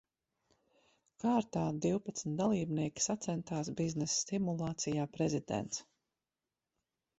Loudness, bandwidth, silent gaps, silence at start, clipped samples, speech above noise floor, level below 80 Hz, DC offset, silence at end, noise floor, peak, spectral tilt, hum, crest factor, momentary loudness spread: -36 LUFS; 8.2 kHz; none; 1.2 s; under 0.1%; over 55 dB; -68 dBFS; under 0.1%; 1.35 s; under -90 dBFS; -20 dBFS; -5 dB/octave; none; 18 dB; 5 LU